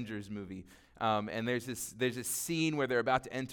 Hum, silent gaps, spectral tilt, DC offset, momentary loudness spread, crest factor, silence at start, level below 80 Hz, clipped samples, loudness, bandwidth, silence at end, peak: none; none; -4 dB/octave; under 0.1%; 12 LU; 18 dB; 0 s; -66 dBFS; under 0.1%; -34 LUFS; 19 kHz; 0 s; -16 dBFS